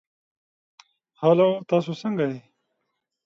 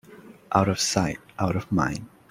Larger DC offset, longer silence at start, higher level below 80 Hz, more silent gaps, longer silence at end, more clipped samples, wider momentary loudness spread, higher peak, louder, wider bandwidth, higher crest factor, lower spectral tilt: neither; first, 1.2 s vs 0.1 s; second, -74 dBFS vs -50 dBFS; neither; first, 0.85 s vs 0.25 s; neither; first, 10 LU vs 7 LU; about the same, -6 dBFS vs -4 dBFS; about the same, -23 LUFS vs -25 LUFS; second, 7.4 kHz vs 16 kHz; about the same, 20 dB vs 22 dB; first, -8 dB/octave vs -4.5 dB/octave